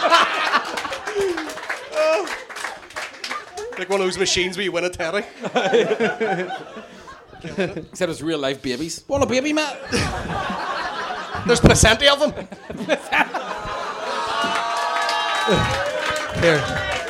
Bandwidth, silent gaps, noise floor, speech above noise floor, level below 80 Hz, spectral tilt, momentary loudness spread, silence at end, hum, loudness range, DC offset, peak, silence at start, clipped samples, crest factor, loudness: 16.5 kHz; none; -41 dBFS; 21 dB; -38 dBFS; -3.5 dB/octave; 14 LU; 0 s; none; 6 LU; under 0.1%; -2 dBFS; 0 s; under 0.1%; 20 dB; -21 LUFS